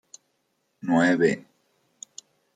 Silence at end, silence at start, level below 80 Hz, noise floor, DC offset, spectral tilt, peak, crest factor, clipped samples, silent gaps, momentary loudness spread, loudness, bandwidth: 1.15 s; 0.85 s; -72 dBFS; -73 dBFS; under 0.1%; -5.5 dB/octave; -8 dBFS; 20 dB; under 0.1%; none; 24 LU; -23 LUFS; 9.2 kHz